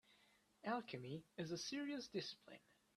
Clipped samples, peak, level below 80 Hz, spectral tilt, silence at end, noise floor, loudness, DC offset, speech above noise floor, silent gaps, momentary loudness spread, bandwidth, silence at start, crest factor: under 0.1%; -30 dBFS; -86 dBFS; -4.5 dB/octave; 0.4 s; -76 dBFS; -48 LUFS; under 0.1%; 26 dB; none; 12 LU; 13.5 kHz; 0.1 s; 20 dB